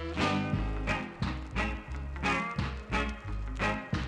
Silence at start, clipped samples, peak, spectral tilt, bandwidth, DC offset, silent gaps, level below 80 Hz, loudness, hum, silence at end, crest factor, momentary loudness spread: 0 s; under 0.1%; -16 dBFS; -6 dB/octave; 10.5 kHz; under 0.1%; none; -38 dBFS; -33 LUFS; none; 0 s; 16 dB; 7 LU